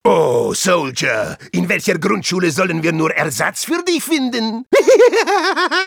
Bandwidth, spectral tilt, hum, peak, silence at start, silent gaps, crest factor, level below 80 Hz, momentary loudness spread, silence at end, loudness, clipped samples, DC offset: 19 kHz; -4 dB/octave; none; 0 dBFS; 0.05 s; none; 14 dB; -56 dBFS; 8 LU; 0 s; -15 LUFS; under 0.1%; under 0.1%